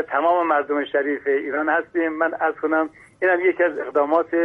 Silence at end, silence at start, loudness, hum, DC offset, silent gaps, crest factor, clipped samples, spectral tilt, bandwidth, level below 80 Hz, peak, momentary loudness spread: 0 s; 0 s; -21 LUFS; none; under 0.1%; none; 16 dB; under 0.1%; -6.5 dB/octave; 4.2 kHz; -66 dBFS; -6 dBFS; 5 LU